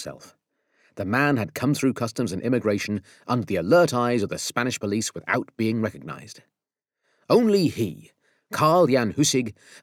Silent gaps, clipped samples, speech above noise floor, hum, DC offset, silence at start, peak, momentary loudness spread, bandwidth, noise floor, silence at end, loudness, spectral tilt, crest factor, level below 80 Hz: none; under 0.1%; 64 dB; none; under 0.1%; 0 s; -6 dBFS; 12 LU; 18 kHz; -88 dBFS; 0.05 s; -23 LUFS; -5 dB/octave; 18 dB; -64 dBFS